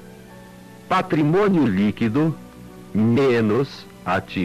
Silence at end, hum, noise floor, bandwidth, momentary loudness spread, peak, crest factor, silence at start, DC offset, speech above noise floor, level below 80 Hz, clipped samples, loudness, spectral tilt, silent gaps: 0 s; none; -42 dBFS; 14 kHz; 13 LU; -12 dBFS; 8 dB; 0 s; under 0.1%; 23 dB; -52 dBFS; under 0.1%; -20 LUFS; -8 dB/octave; none